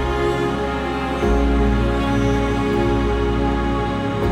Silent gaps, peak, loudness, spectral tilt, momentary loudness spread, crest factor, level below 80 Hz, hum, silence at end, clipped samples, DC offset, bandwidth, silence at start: none; -8 dBFS; -20 LUFS; -7 dB/octave; 4 LU; 12 dB; -24 dBFS; none; 0 s; under 0.1%; under 0.1%; 11 kHz; 0 s